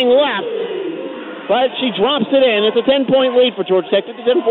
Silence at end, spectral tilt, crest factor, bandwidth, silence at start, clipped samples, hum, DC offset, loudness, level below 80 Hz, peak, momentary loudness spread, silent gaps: 0 s; -9 dB/octave; 12 dB; 4.3 kHz; 0 s; under 0.1%; none; under 0.1%; -15 LUFS; -58 dBFS; -4 dBFS; 10 LU; none